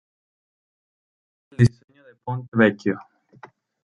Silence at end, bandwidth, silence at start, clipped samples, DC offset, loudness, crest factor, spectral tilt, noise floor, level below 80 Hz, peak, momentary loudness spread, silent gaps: 0.8 s; 11 kHz; 1.6 s; under 0.1%; under 0.1%; -22 LUFS; 24 dB; -8 dB/octave; -49 dBFS; -54 dBFS; -2 dBFS; 17 LU; 1.84-1.88 s, 2.48-2.52 s